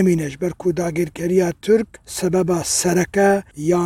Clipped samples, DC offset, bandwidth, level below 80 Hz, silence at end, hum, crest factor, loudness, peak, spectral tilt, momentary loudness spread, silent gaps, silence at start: under 0.1%; under 0.1%; 16 kHz; -48 dBFS; 0 s; none; 14 dB; -19 LUFS; -4 dBFS; -5 dB/octave; 6 LU; none; 0 s